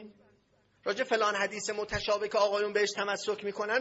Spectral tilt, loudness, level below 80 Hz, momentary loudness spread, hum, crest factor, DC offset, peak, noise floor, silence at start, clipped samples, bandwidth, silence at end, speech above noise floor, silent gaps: -2.5 dB/octave; -31 LUFS; -58 dBFS; 7 LU; none; 16 dB; under 0.1%; -14 dBFS; -68 dBFS; 0 s; under 0.1%; 8 kHz; 0 s; 38 dB; none